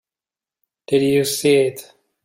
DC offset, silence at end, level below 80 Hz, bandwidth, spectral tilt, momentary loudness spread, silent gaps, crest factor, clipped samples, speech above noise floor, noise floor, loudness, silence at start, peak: under 0.1%; 0.4 s; -62 dBFS; 16.5 kHz; -4.5 dB/octave; 7 LU; none; 16 dB; under 0.1%; over 73 dB; under -90 dBFS; -18 LUFS; 0.9 s; -4 dBFS